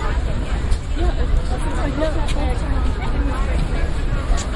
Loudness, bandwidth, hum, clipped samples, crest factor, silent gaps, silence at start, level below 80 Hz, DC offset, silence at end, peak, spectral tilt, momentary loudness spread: -23 LUFS; 11.5 kHz; none; under 0.1%; 14 dB; none; 0 s; -20 dBFS; under 0.1%; 0 s; -4 dBFS; -6 dB/octave; 2 LU